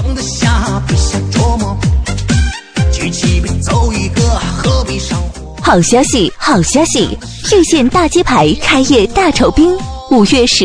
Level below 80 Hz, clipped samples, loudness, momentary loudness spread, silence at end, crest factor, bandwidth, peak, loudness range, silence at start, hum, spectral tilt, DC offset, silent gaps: -20 dBFS; under 0.1%; -11 LUFS; 8 LU; 0 s; 10 dB; 11 kHz; 0 dBFS; 4 LU; 0 s; none; -4.5 dB/octave; under 0.1%; none